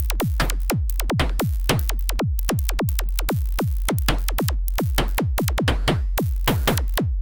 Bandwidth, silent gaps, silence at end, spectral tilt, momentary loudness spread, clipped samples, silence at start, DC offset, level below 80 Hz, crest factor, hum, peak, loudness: 19 kHz; none; 0 s; -5 dB/octave; 3 LU; under 0.1%; 0 s; under 0.1%; -24 dBFS; 16 dB; none; -6 dBFS; -23 LUFS